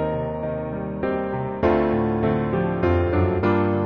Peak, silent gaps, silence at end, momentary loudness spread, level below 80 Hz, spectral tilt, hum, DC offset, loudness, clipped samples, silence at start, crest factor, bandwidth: -6 dBFS; none; 0 s; 7 LU; -38 dBFS; -7.5 dB/octave; none; under 0.1%; -22 LUFS; under 0.1%; 0 s; 14 dB; 5.6 kHz